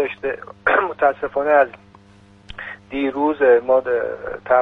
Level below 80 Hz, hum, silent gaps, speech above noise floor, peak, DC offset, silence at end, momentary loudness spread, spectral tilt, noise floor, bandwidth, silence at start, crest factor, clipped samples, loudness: -52 dBFS; none; none; 30 dB; -2 dBFS; under 0.1%; 0 s; 16 LU; -7 dB/octave; -48 dBFS; 4.7 kHz; 0 s; 18 dB; under 0.1%; -19 LUFS